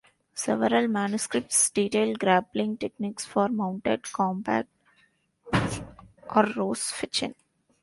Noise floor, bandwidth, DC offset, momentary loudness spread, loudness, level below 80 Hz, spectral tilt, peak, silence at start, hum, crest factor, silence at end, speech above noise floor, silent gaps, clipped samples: -66 dBFS; 11.5 kHz; under 0.1%; 10 LU; -26 LUFS; -56 dBFS; -4 dB/octave; -6 dBFS; 0.35 s; none; 20 dB; 0.5 s; 40 dB; none; under 0.1%